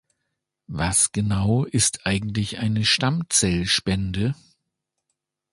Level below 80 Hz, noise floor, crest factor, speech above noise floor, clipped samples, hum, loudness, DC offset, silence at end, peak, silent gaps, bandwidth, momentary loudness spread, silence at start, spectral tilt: -42 dBFS; -80 dBFS; 18 dB; 58 dB; under 0.1%; none; -21 LUFS; under 0.1%; 1.2 s; -6 dBFS; none; 11.5 kHz; 8 LU; 0.7 s; -3.5 dB/octave